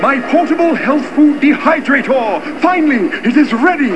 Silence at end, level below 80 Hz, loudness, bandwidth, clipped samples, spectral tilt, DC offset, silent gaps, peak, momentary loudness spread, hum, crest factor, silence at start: 0 s; -54 dBFS; -12 LUFS; 8.8 kHz; under 0.1%; -6 dB/octave; 2%; none; 0 dBFS; 4 LU; none; 12 dB; 0 s